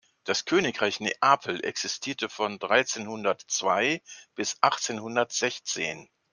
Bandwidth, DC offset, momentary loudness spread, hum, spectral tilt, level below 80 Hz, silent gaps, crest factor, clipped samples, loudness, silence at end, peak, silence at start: 10.5 kHz; under 0.1%; 8 LU; none; -2 dB/octave; -74 dBFS; none; 24 dB; under 0.1%; -27 LUFS; 0.3 s; -4 dBFS; 0.25 s